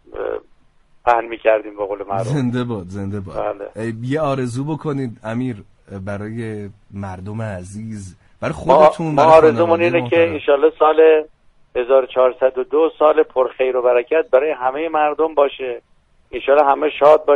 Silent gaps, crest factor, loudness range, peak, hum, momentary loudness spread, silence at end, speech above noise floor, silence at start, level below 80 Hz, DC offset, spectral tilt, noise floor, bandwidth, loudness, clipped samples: none; 16 dB; 12 LU; 0 dBFS; none; 17 LU; 0 s; 36 dB; 0.15 s; -50 dBFS; under 0.1%; -7 dB/octave; -52 dBFS; 11 kHz; -17 LUFS; under 0.1%